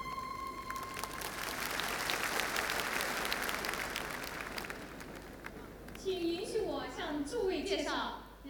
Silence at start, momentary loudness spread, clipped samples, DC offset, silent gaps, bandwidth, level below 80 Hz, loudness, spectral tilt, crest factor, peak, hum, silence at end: 0 s; 13 LU; under 0.1%; under 0.1%; none; over 20 kHz; -56 dBFS; -37 LUFS; -2.5 dB/octave; 24 dB; -14 dBFS; none; 0 s